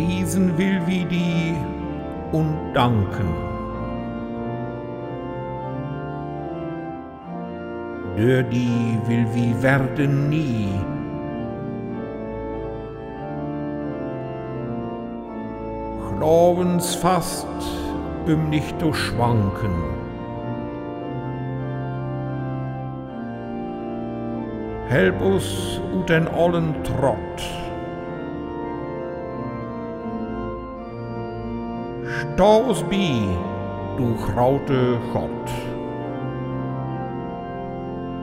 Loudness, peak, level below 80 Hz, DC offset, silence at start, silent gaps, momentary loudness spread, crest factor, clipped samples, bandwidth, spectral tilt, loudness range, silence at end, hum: -24 LUFS; -4 dBFS; -42 dBFS; under 0.1%; 0 s; none; 11 LU; 20 dB; under 0.1%; 16 kHz; -6.5 dB/octave; 9 LU; 0 s; none